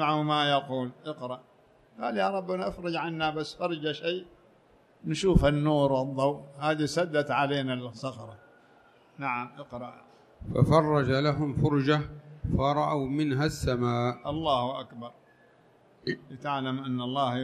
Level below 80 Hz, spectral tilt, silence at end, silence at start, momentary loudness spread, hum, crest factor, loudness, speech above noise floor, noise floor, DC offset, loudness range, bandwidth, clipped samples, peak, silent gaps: -46 dBFS; -6.5 dB/octave; 0 s; 0 s; 15 LU; none; 22 dB; -29 LUFS; 33 dB; -61 dBFS; under 0.1%; 6 LU; 13 kHz; under 0.1%; -6 dBFS; none